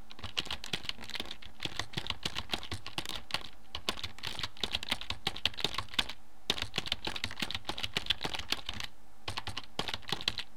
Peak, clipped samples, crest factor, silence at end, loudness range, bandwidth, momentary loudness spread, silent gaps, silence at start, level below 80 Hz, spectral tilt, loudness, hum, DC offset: -10 dBFS; under 0.1%; 30 dB; 0 s; 4 LU; 17.5 kHz; 8 LU; none; 0 s; -56 dBFS; -2 dB/octave; -36 LUFS; none; 1%